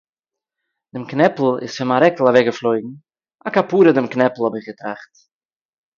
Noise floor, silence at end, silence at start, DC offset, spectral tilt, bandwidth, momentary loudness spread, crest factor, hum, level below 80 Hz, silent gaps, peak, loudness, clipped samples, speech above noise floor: under -90 dBFS; 0.95 s; 0.95 s; under 0.1%; -6.5 dB/octave; 7.2 kHz; 17 LU; 18 dB; none; -64 dBFS; none; 0 dBFS; -17 LUFS; under 0.1%; over 73 dB